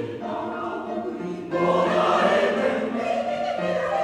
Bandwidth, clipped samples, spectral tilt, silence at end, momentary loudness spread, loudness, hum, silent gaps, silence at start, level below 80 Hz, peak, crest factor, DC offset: 11 kHz; under 0.1%; -5.5 dB/octave; 0 s; 10 LU; -24 LUFS; none; none; 0 s; -62 dBFS; -8 dBFS; 16 dB; under 0.1%